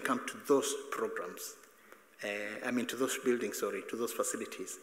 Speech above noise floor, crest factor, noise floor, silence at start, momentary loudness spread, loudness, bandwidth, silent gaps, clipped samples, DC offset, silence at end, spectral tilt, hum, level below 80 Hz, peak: 24 dB; 20 dB; -60 dBFS; 0 s; 11 LU; -36 LUFS; 16 kHz; none; under 0.1%; under 0.1%; 0 s; -2.5 dB/octave; none; -86 dBFS; -16 dBFS